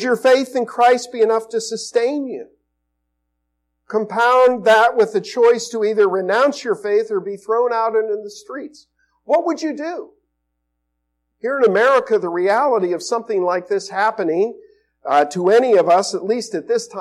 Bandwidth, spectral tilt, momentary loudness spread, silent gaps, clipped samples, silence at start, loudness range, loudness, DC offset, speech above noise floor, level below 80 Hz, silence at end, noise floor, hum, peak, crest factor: 13 kHz; -4 dB/octave; 12 LU; none; under 0.1%; 0 s; 7 LU; -17 LUFS; under 0.1%; 56 dB; -72 dBFS; 0 s; -73 dBFS; none; -6 dBFS; 12 dB